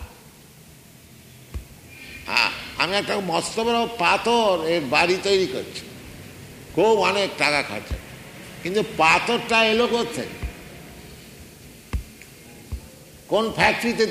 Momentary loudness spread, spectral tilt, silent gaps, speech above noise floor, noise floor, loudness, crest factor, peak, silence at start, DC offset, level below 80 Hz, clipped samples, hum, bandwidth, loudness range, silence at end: 23 LU; -3.5 dB/octave; none; 26 dB; -47 dBFS; -21 LUFS; 20 dB; -4 dBFS; 0 s; under 0.1%; -44 dBFS; under 0.1%; none; 15.5 kHz; 6 LU; 0 s